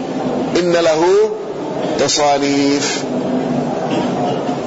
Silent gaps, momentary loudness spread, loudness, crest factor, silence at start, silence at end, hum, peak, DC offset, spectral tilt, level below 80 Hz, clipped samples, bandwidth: none; 7 LU; -16 LUFS; 12 dB; 0 s; 0 s; none; -4 dBFS; under 0.1%; -4 dB/octave; -50 dBFS; under 0.1%; 8 kHz